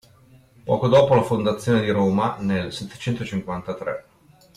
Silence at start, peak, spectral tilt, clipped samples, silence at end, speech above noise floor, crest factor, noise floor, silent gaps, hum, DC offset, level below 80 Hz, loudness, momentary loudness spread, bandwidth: 0.65 s; -6 dBFS; -7 dB/octave; under 0.1%; 0.55 s; 31 dB; 16 dB; -52 dBFS; none; none; under 0.1%; -54 dBFS; -22 LUFS; 14 LU; 14 kHz